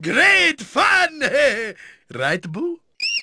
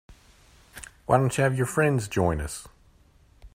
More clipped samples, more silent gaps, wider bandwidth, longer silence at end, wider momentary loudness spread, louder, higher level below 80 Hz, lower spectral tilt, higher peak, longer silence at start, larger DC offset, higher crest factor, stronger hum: neither; neither; second, 11 kHz vs 16 kHz; about the same, 0 s vs 0.05 s; about the same, 15 LU vs 17 LU; first, -17 LUFS vs -25 LUFS; second, -56 dBFS vs -46 dBFS; second, -3 dB/octave vs -6 dB/octave; about the same, -4 dBFS vs -4 dBFS; about the same, 0 s vs 0.1 s; neither; second, 16 dB vs 22 dB; neither